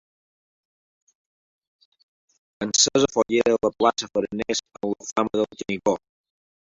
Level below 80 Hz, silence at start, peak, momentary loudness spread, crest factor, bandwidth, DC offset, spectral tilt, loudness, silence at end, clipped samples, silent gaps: -60 dBFS; 2.6 s; -4 dBFS; 10 LU; 22 dB; 8 kHz; under 0.1%; -2.5 dB/octave; -23 LUFS; 0.7 s; under 0.1%; 5.12-5.16 s